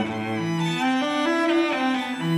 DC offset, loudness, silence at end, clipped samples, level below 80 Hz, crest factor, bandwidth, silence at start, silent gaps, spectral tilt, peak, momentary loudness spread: under 0.1%; -23 LUFS; 0 s; under 0.1%; -66 dBFS; 12 dB; 13.5 kHz; 0 s; none; -5.5 dB/octave; -12 dBFS; 5 LU